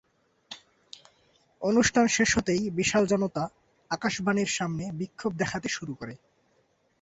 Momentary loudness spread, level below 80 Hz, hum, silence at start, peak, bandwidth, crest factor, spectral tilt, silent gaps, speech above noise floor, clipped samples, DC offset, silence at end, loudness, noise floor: 18 LU; -56 dBFS; none; 0.5 s; -10 dBFS; 8.2 kHz; 18 dB; -4 dB/octave; none; 42 dB; under 0.1%; under 0.1%; 0.85 s; -27 LUFS; -69 dBFS